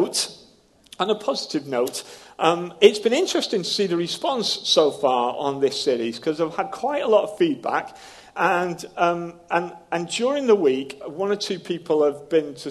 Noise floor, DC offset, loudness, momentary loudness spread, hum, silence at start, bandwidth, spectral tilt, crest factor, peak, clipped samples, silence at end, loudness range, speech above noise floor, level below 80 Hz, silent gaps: -55 dBFS; under 0.1%; -22 LUFS; 9 LU; none; 0 s; 12.5 kHz; -3.5 dB/octave; 22 dB; 0 dBFS; under 0.1%; 0 s; 3 LU; 32 dB; -66 dBFS; none